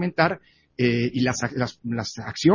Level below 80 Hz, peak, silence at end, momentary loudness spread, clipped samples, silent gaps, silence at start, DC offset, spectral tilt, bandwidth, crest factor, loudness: -54 dBFS; -2 dBFS; 0 s; 9 LU; under 0.1%; none; 0 s; under 0.1%; -5.5 dB/octave; 7.4 kHz; 20 dB; -25 LUFS